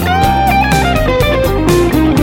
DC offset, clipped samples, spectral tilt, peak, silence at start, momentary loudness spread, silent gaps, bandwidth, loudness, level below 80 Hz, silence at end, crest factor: under 0.1%; under 0.1%; -5.5 dB/octave; 0 dBFS; 0 s; 2 LU; none; 18.5 kHz; -11 LUFS; -20 dBFS; 0 s; 10 dB